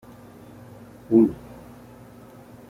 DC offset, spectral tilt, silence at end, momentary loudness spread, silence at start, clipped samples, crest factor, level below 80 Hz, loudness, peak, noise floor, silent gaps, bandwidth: under 0.1%; -9.5 dB/octave; 1.35 s; 27 LU; 1.1 s; under 0.1%; 22 dB; -56 dBFS; -20 LUFS; -6 dBFS; -46 dBFS; none; 14 kHz